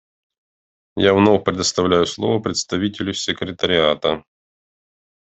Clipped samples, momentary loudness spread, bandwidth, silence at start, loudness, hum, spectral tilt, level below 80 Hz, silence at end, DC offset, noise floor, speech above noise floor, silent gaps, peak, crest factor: under 0.1%; 8 LU; 8.4 kHz; 0.95 s; -18 LUFS; none; -4 dB/octave; -54 dBFS; 1.15 s; under 0.1%; under -90 dBFS; over 72 dB; none; -2 dBFS; 18 dB